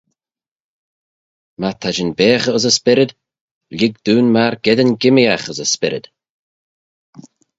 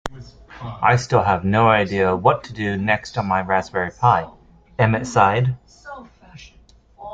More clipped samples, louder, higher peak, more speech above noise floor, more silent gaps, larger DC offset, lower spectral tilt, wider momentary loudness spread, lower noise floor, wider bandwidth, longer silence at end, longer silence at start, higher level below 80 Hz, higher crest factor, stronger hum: neither; first, -15 LUFS vs -19 LUFS; about the same, 0 dBFS vs -2 dBFS; first, over 76 dB vs 33 dB; first, 3.41-3.61 s vs none; neither; second, -4 dB/octave vs -6.5 dB/octave; second, 9 LU vs 20 LU; first, under -90 dBFS vs -51 dBFS; about the same, 8 kHz vs 8.8 kHz; first, 1.6 s vs 0 s; first, 1.6 s vs 0.05 s; second, -56 dBFS vs -48 dBFS; about the same, 18 dB vs 18 dB; neither